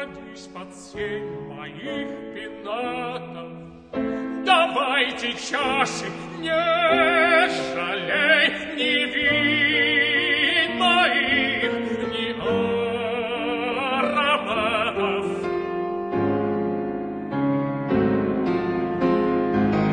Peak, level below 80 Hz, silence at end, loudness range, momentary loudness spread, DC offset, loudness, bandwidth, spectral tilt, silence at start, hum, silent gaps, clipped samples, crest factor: -4 dBFS; -54 dBFS; 0 s; 7 LU; 15 LU; under 0.1%; -22 LUFS; 10 kHz; -4.5 dB/octave; 0 s; none; none; under 0.1%; 18 dB